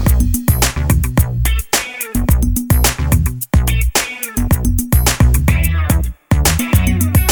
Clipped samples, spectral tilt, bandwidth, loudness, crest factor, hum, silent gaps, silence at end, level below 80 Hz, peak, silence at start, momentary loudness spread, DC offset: under 0.1%; -4.5 dB/octave; over 20 kHz; -15 LUFS; 14 dB; none; none; 0 s; -16 dBFS; 0 dBFS; 0 s; 4 LU; under 0.1%